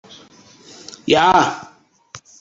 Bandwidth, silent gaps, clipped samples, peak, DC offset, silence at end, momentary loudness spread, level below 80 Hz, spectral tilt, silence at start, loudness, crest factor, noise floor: 8 kHz; none; under 0.1%; 0 dBFS; under 0.1%; 0.25 s; 24 LU; -54 dBFS; -3.5 dB/octave; 1.05 s; -15 LUFS; 20 dB; -47 dBFS